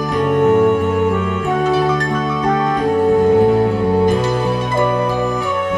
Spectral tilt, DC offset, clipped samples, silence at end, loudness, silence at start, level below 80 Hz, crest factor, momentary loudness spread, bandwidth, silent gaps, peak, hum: -7 dB/octave; under 0.1%; under 0.1%; 0 s; -16 LUFS; 0 s; -40 dBFS; 12 dB; 5 LU; 11.5 kHz; none; -4 dBFS; none